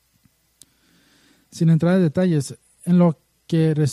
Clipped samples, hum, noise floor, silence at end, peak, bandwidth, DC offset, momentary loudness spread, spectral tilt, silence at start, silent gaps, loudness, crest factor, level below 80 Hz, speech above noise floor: under 0.1%; none; -62 dBFS; 0 s; -6 dBFS; 12 kHz; under 0.1%; 16 LU; -8 dB/octave; 1.55 s; none; -19 LUFS; 14 dB; -60 dBFS; 44 dB